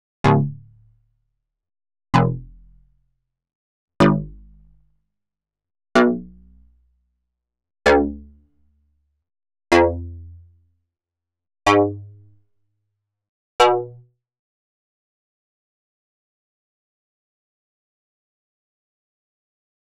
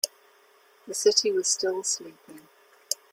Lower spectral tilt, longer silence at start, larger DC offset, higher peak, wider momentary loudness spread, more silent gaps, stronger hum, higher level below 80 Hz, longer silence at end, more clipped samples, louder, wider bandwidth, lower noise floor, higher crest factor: first, -5 dB/octave vs -0.5 dB/octave; first, 0.25 s vs 0.05 s; neither; first, -2 dBFS vs -6 dBFS; first, 20 LU vs 12 LU; first, 3.55-3.88 s, 13.29-13.59 s vs none; neither; first, -46 dBFS vs -80 dBFS; first, 6.1 s vs 0.2 s; neither; first, -19 LUFS vs -25 LUFS; second, 5.4 kHz vs 16.5 kHz; first, -86 dBFS vs -59 dBFS; about the same, 24 dB vs 24 dB